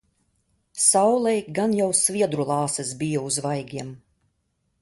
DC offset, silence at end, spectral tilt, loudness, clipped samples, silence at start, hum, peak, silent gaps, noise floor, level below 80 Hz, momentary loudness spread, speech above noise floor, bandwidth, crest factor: under 0.1%; 0.85 s; -4 dB/octave; -22 LUFS; under 0.1%; 0.75 s; none; -4 dBFS; none; -72 dBFS; -64 dBFS; 15 LU; 49 dB; 12 kHz; 20 dB